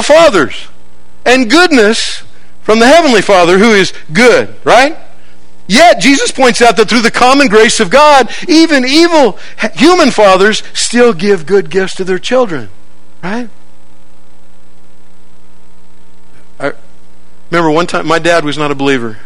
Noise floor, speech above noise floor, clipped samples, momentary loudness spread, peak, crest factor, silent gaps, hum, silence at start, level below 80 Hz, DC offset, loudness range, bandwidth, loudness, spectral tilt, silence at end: -46 dBFS; 38 dB; 3%; 12 LU; 0 dBFS; 10 dB; none; none; 0 s; -40 dBFS; 10%; 20 LU; 18.5 kHz; -7 LUFS; -3.5 dB/octave; 0.1 s